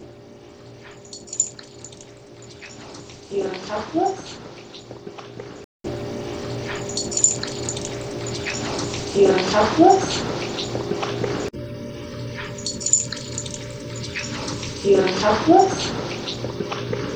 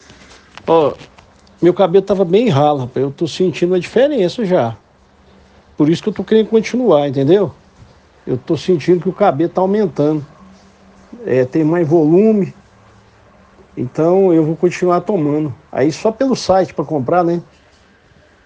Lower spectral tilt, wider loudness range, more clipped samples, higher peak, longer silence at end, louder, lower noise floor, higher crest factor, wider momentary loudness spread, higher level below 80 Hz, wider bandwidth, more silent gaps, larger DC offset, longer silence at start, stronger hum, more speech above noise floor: second, -3.5 dB/octave vs -7 dB/octave; first, 10 LU vs 2 LU; neither; about the same, 0 dBFS vs 0 dBFS; second, 0 s vs 1 s; second, -22 LUFS vs -15 LUFS; second, -43 dBFS vs -49 dBFS; first, 24 dB vs 16 dB; first, 22 LU vs 10 LU; about the same, -48 dBFS vs -52 dBFS; about the same, 9.4 kHz vs 8.8 kHz; first, 5.64-5.80 s vs none; neither; second, 0 s vs 0.65 s; neither; second, 26 dB vs 35 dB